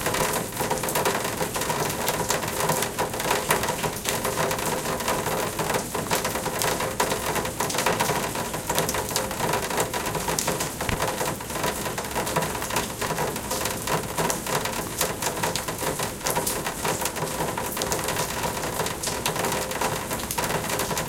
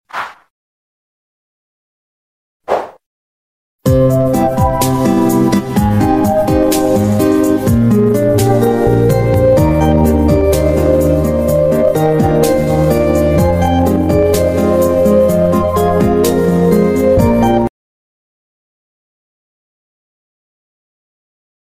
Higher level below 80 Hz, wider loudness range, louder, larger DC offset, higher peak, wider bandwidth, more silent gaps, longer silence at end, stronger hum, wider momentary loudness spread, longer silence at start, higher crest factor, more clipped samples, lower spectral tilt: second, -46 dBFS vs -26 dBFS; second, 2 LU vs 8 LU; second, -26 LUFS vs -12 LUFS; second, under 0.1% vs 0.9%; about the same, 0 dBFS vs 0 dBFS; about the same, 17 kHz vs 16 kHz; second, none vs 0.50-2.60 s, 3.06-3.79 s; second, 0 s vs 4.1 s; neither; about the same, 3 LU vs 3 LU; second, 0 s vs 0.15 s; first, 26 dB vs 12 dB; neither; second, -3 dB/octave vs -7 dB/octave